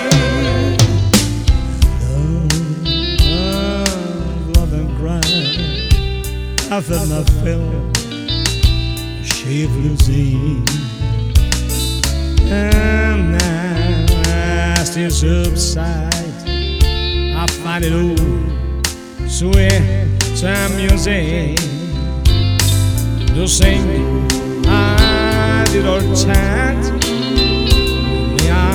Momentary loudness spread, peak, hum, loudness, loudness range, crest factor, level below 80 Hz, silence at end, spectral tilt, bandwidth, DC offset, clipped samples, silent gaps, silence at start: 6 LU; 0 dBFS; none; -15 LUFS; 3 LU; 14 dB; -18 dBFS; 0 s; -4.5 dB/octave; over 20 kHz; under 0.1%; under 0.1%; none; 0 s